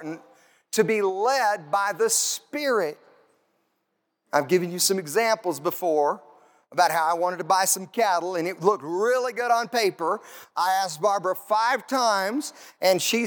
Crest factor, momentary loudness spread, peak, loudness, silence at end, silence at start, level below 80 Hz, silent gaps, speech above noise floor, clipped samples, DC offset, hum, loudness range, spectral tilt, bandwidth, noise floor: 18 dB; 7 LU; -6 dBFS; -24 LUFS; 0 s; 0 s; -86 dBFS; none; 52 dB; under 0.1%; under 0.1%; none; 2 LU; -2.5 dB/octave; 19.5 kHz; -76 dBFS